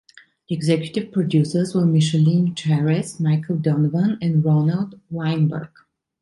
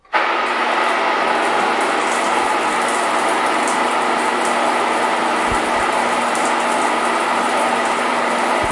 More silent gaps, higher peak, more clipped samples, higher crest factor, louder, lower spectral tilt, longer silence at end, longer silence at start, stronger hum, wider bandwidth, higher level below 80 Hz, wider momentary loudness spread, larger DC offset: neither; about the same, -4 dBFS vs -4 dBFS; neither; about the same, 14 dB vs 14 dB; second, -20 LUFS vs -17 LUFS; first, -7.5 dB/octave vs -2 dB/octave; first, 0.55 s vs 0 s; first, 0.5 s vs 0.1 s; neither; about the same, 11.5 kHz vs 11.5 kHz; second, -60 dBFS vs -48 dBFS; first, 7 LU vs 1 LU; neither